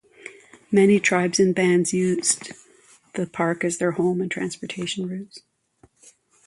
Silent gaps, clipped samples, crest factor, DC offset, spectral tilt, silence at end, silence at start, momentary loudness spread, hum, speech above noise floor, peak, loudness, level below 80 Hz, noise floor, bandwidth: none; under 0.1%; 18 dB; under 0.1%; -4.5 dB/octave; 1.1 s; 0.25 s; 18 LU; none; 38 dB; -6 dBFS; -22 LUFS; -66 dBFS; -59 dBFS; 11.5 kHz